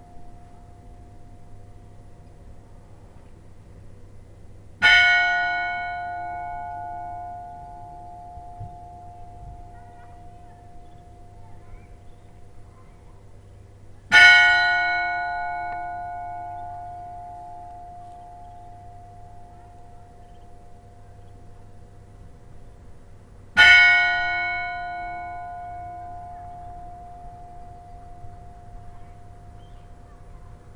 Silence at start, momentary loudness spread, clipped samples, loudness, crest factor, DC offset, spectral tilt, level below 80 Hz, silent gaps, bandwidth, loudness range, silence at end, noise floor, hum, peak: 0.15 s; 31 LU; under 0.1%; -18 LUFS; 26 dB; under 0.1%; -2 dB/octave; -46 dBFS; none; 12.5 kHz; 24 LU; 0 s; -46 dBFS; none; 0 dBFS